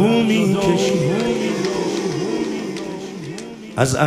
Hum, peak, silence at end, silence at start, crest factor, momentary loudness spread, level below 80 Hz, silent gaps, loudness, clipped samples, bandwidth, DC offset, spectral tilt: none; -2 dBFS; 0 s; 0 s; 18 dB; 13 LU; -50 dBFS; none; -20 LUFS; under 0.1%; 15.5 kHz; under 0.1%; -5.5 dB/octave